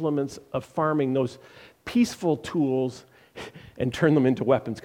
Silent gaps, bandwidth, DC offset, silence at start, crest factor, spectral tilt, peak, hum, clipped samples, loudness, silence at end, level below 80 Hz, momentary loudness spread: none; 16 kHz; under 0.1%; 0 s; 18 dB; -7 dB/octave; -6 dBFS; none; under 0.1%; -25 LUFS; 0.05 s; -58 dBFS; 19 LU